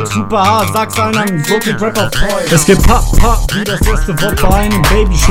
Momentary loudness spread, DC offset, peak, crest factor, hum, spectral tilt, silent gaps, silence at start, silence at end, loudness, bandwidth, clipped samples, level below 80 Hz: 5 LU; under 0.1%; 0 dBFS; 10 dB; none; -4.5 dB/octave; none; 0 s; 0 s; -12 LUFS; 16.5 kHz; 2%; -14 dBFS